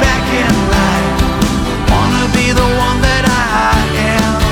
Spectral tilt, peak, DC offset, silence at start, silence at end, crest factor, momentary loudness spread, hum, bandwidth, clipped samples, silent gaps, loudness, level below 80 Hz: -5 dB/octave; 0 dBFS; under 0.1%; 0 s; 0 s; 10 dB; 2 LU; none; 19 kHz; under 0.1%; none; -12 LUFS; -20 dBFS